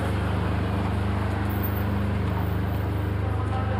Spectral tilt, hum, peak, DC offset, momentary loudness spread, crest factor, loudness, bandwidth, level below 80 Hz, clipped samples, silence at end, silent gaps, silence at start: -8 dB/octave; none; -14 dBFS; under 0.1%; 1 LU; 12 dB; -27 LUFS; 16 kHz; -34 dBFS; under 0.1%; 0 s; none; 0 s